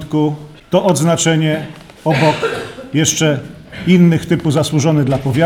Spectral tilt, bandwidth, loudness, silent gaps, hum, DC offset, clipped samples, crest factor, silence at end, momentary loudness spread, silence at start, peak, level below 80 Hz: -5 dB/octave; 16 kHz; -14 LUFS; none; none; under 0.1%; under 0.1%; 14 dB; 0 s; 11 LU; 0 s; -2 dBFS; -46 dBFS